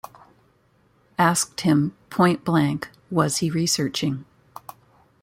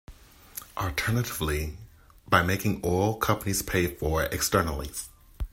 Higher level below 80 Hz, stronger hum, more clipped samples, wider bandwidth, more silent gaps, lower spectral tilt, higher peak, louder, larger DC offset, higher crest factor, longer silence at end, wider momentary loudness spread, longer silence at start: second, -60 dBFS vs -42 dBFS; neither; neither; about the same, 16.5 kHz vs 16.5 kHz; neither; about the same, -4.5 dB/octave vs -4.5 dB/octave; about the same, -4 dBFS vs -6 dBFS; first, -22 LUFS vs -27 LUFS; neither; about the same, 20 dB vs 24 dB; first, 1 s vs 0.05 s; about the same, 17 LU vs 15 LU; first, 1.2 s vs 0.1 s